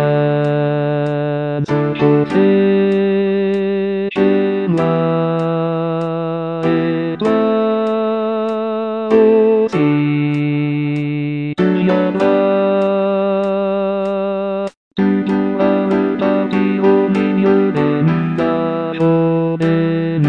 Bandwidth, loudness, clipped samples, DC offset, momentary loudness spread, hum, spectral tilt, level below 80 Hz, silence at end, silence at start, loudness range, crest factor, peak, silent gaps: 7.4 kHz; -16 LUFS; under 0.1%; 0.2%; 6 LU; none; -9 dB/octave; -54 dBFS; 0 s; 0 s; 2 LU; 14 dB; 0 dBFS; 14.77-14.91 s